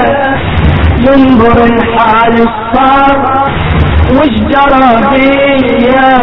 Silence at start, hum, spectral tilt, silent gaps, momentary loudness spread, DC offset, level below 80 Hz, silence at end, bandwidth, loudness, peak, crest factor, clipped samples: 0 s; none; -9 dB/octave; none; 5 LU; under 0.1%; -20 dBFS; 0 s; 6 kHz; -7 LUFS; 0 dBFS; 6 dB; 2%